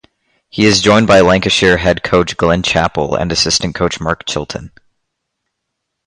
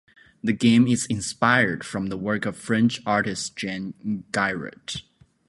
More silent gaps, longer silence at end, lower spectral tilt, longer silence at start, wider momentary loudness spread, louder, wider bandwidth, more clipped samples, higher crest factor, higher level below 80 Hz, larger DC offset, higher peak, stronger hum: neither; first, 1.4 s vs 0.45 s; about the same, -4 dB/octave vs -4.5 dB/octave; about the same, 0.55 s vs 0.45 s; about the same, 11 LU vs 13 LU; first, -12 LUFS vs -23 LUFS; about the same, 11.5 kHz vs 11.5 kHz; neither; second, 14 dB vs 20 dB; first, -34 dBFS vs -56 dBFS; neither; first, 0 dBFS vs -4 dBFS; neither